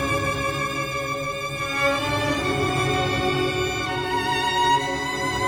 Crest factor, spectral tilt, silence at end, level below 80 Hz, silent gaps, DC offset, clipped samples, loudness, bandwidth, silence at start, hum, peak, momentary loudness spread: 14 dB; -4 dB/octave; 0 s; -42 dBFS; none; under 0.1%; under 0.1%; -23 LUFS; over 20 kHz; 0 s; none; -8 dBFS; 5 LU